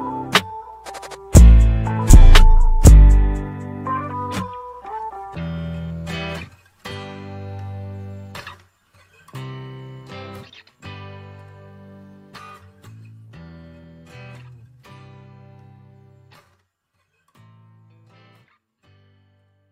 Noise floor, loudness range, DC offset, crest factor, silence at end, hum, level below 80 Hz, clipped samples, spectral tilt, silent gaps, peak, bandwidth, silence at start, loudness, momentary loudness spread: -70 dBFS; 28 LU; under 0.1%; 18 dB; 10.15 s; none; -18 dBFS; under 0.1%; -5.5 dB/octave; none; 0 dBFS; 15.5 kHz; 0 s; -16 LUFS; 28 LU